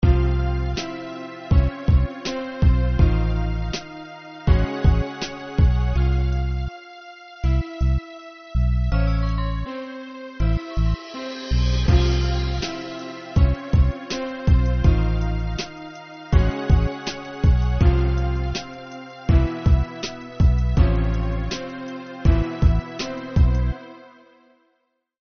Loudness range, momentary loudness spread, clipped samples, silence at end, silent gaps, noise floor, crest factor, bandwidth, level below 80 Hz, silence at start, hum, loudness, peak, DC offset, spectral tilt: 3 LU; 14 LU; under 0.1%; 1.25 s; none; -71 dBFS; 16 dB; 6.6 kHz; -22 dBFS; 0 s; none; -22 LUFS; -4 dBFS; under 0.1%; -6.5 dB/octave